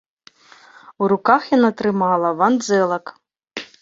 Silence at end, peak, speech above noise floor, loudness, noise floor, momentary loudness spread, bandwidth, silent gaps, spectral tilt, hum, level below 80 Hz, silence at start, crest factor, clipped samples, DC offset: 0.15 s; 0 dBFS; 32 dB; -18 LUFS; -49 dBFS; 17 LU; 7.8 kHz; none; -5.5 dB/octave; none; -64 dBFS; 1 s; 20 dB; under 0.1%; under 0.1%